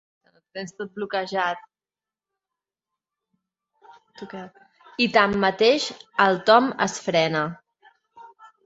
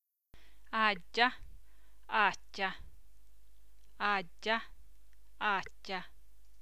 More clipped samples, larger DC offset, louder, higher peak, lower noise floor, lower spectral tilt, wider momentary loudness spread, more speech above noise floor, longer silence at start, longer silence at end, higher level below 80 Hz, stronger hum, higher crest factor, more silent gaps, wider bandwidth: neither; second, under 0.1% vs 0.5%; first, -21 LUFS vs -34 LUFS; first, -2 dBFS vs -12 dBFS; first, under -90 dBFS vs -64 dBFS; about the same, -4 dB/octave vs -3 dB/octave; first, 20 LU vs 13 LU; first, over 68 dB vs 30 dB; first, 0.55 s vs 0 s; second, 0.4 s vs 0.55 s; about the same, -64 dBFS vs -62 dBFS; neither; about the same, 22 dB vs 26 dB; neither; second, 8 kHz vs 16 kHz